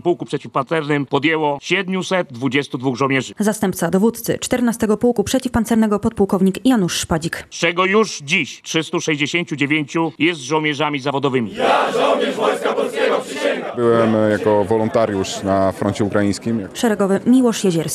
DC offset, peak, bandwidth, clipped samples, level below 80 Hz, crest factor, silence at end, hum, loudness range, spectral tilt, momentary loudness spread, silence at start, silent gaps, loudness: under 0.1%; -2 dBFS; 13.5 kHz; under 0.1%; -48 dBFS; 16 dB; 0 s; none; 2 LU; -5 dB/octave; 5 LU; 0.05 s; none; -18 LUFS